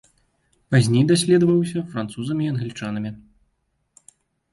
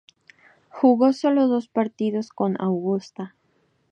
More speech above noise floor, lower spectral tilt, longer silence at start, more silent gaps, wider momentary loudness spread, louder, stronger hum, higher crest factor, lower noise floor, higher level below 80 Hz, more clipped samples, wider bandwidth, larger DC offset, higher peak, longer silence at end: first, 51 dB vs 45 dB; second, -6 dB/octave vs -8 dB/octave; about the same, 0.7 s vs 0.75 s; neither; about the same, 12 LU vs 13 LU; about the same, -21 LUFS vs -22 LUFS; neither; about the same, 18 dB vs 18 dB; first, -70 dBFS vs -66 dBFS; first, -58 dBFS vs -76 dBFS; neither; first, 11.5 kHz vs 8.4 kHz; neither; about the same, -4 dBFS vs -6 dBFS; first, 1.35 s vs 0.65 s